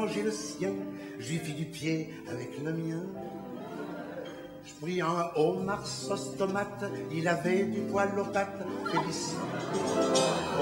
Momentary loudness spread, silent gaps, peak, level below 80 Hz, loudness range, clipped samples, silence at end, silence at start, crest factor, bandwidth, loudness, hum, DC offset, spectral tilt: 12 LU; none; -14 dBFS; -66 dBFS; 6 LU; under 0.1%; 0 s; 0 s; 18 dB; 16 kHz; -32 LUFS; none; under 0.1%; -5 dB/octave